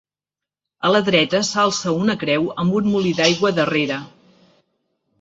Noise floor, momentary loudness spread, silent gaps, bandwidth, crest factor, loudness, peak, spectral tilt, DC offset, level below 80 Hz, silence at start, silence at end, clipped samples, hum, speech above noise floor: -88 dBFS; 5 LU; none; 8 kHz; 18 dB; -18 LUFS; -2 dBFS; -4.5 dB/octave; under 0.1%; -58 dBFS; 0.8 s; 1.15 s; under 0.1%; none; 70 dB